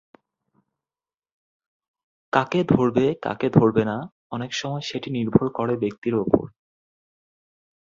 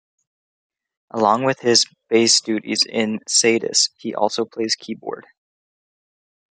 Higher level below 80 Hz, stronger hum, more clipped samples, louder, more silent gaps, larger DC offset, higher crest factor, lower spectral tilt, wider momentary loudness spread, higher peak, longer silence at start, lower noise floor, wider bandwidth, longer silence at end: first, -54 dBFS vs -72 dBFS; neither; neither; second, -23 LUFS vs -18 LUFS; first, 4.12-4.30 s, 5.98-6.02 s vs none; neither; about the same, 24 dB vs 20 dB; first, -7 dB/octave vs -2 dB/octave; second, 10 LU vs 13 LU; about the same, -2 dBFS vs -2 dBFS; first, 2.35 s vs 1.15 s; about the same, under -90 dBFS vs under -90 dBFS; second, 7.6 kHz vs 11 kHz; first, 1.45 s vs 1.3 s